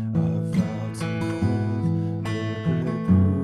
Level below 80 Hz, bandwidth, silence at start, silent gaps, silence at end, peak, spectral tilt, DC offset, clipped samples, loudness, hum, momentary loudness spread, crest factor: -48 dBFS; 11.5 kHz; 0 s; none; 0 s; -8 dBFS; -8 dB/octave; under 0.1%; under 0.1%; -25 LUFS; none; 7 LU; 16 dB